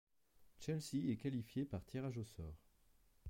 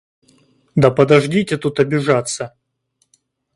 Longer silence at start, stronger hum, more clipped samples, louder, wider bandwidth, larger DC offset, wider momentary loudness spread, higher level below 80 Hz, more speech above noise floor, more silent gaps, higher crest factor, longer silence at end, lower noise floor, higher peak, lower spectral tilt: second, 0.4 s vs 0.75 s; neither; neither; second, -45 LUFS vs -16 LUFS; first, 16.5 kHz vs 11.5 kHz; neither; about the same, 12 LU vs 12 LU; second, -64 dBFS vs -52 dBFS; second, 28 dB vs 52 dB; neither; about the same, 16 dB vs 18 dB; second, 0 s vs 1.05 s; first, -72 dBFS vs -67 dBFS; second, -30 dBFS vs 0 dBFS; about the same, -6.5 dB/octave vs -6 dB/octave